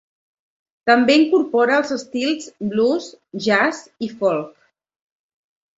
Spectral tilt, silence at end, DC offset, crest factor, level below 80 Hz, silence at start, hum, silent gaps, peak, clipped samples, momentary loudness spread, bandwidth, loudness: -4.5 dB/octave; 1.3 s; under 0.1%; 18 dB; -66 dBFS; 0.85 s; none; none; -2 dBFS; under 0.1%; 12 LU; 8 kHz; -19 LUFS